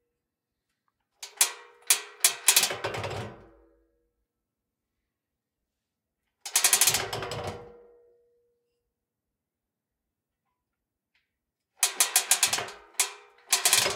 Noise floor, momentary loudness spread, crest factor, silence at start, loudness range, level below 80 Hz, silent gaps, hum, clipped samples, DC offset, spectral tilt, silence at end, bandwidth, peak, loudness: -87 dBFS; 18 LU; 28 dB; 1.2 s; 14 LU; -66 dBFS; none; none; under 0.1%; under 0.1%; 0.5 dB/octave; 0 s; 17.5 kHz; -2 dBFS; -24 LUFS